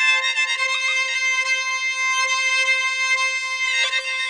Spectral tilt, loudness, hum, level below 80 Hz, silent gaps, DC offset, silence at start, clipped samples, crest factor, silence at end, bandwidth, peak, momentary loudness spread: 6 dB/octave; -18 LUFS; 60 Hz at -80 dBFS; -76 dBFS; none; under 0.1%; 0 s; under 0.1%; 14 dB; 0 s; 10 kHz; -8 dBFS; 3 LU